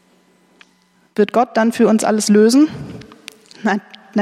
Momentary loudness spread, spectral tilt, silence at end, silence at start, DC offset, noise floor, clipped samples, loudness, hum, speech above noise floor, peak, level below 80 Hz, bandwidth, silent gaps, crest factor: 21 LU; -5 dB/octave; 0 s; 1.2 s; under 0.1%; -56 dBFS; under 0.1%; -15 LUFS; none; 43 dB; -2 dBFS; -60 dBFS; 14 kHz; none; 14 dB